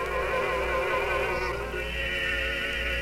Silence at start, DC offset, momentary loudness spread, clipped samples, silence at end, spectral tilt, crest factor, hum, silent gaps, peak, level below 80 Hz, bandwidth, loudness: 0 s; under 0.1%; 4 LU; under 0.1%; 0 s; -4 dB/octave; 14 dB; none; none; -16 dBFS; -38 dBFS; 16 kHz; -28 LUFS